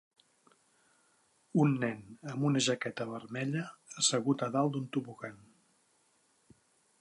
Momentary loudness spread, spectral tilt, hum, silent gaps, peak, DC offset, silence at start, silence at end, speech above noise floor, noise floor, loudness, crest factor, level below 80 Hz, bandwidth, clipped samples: 16 LU; -4.5 dB/octave; none; none; -14 dBFS; under 0.1%; 1.55 s; 1.65 s; 39 dB; -72 dBFS; -33 LUFS; 22 dB; -80 dBFS; 11.5 kHz; under 0.1%